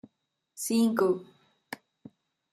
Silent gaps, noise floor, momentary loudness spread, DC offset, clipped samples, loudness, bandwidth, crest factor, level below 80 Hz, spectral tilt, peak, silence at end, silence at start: none; -79 dBFS; 20 LU; under 0.1%; under 0.1%; -28 LUFS; 14.5 kHz; 20 dB; -78 dBFS; -4.5 dB/octave; -12 dBFS; 0.75 s; 0.55 s